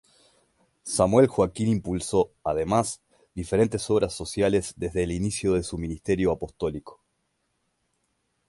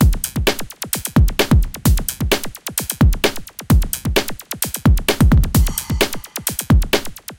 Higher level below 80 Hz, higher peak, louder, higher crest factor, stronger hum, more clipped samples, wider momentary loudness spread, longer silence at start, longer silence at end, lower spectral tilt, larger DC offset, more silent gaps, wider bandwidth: second, -46 dBFS vs -20 dBFS; second, -6 dBFS vs 0 dBFS; second, -25 LUFS vs -18 LUFS; about the same, 20 dB vs 16 dB; neither; neither; first, 11 LU vs 8 LU; first, 0.85 s vs 0 s; first, 1.55 s vs 0.05 s; about the same, -5.5 dB/octave vs -4.5 dB/octave; neither; neither; second, 11.5 kHz vs 17.5 kHz